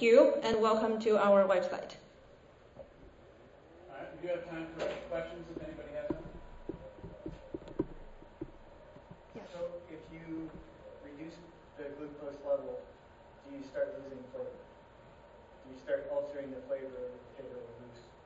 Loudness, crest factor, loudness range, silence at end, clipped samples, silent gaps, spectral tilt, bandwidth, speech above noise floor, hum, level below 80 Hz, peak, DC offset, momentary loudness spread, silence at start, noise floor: -35 LUFS; 24 dB; 14 LU; 0.1 s; under 0.1%; none; -4 dB/octave; 7.6 kHz; 27 dB; none; -60 dBFS; -12 dBFS; under 0.1%; 26 LU; 0 s; -59 dBFS